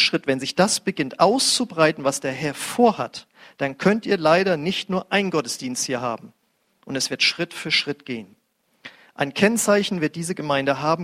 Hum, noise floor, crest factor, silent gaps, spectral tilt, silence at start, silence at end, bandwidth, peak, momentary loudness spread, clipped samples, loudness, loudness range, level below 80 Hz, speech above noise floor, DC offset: none; -64 dBFS; 20 dB; none; -3.5 dB/octave; 0 s; 0 s; 16 kHz; -2 dBFS; 11 LU; under 0.1%; -21 LUFS; 4 LU; -64 dBFS; 42 dB; under 0.1%